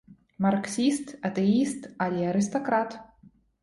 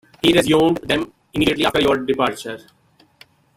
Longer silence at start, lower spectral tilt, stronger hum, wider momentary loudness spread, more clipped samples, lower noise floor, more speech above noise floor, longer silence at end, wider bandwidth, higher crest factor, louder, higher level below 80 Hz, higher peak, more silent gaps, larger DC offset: second, 0.1 s vs 0.25 s; about the same, -5.5 dB/octave vs -4.5 dB/octave; neither; second, 7 LU vs 14 LU; neither; first, -58 dBFS vs -52 dBFS; about the same, 32 dB vs 34 dB; second, 0.35 s vs 1 s; second, 11.5 kHz vs 16 kHz; about the same, 16 dB vs 18 dB; second, -27 LUFS vs -18 LUFS; second, -64 dBFS vs -46 dBFS; second, -12 dBFS vs -2 dBFS; neither; neither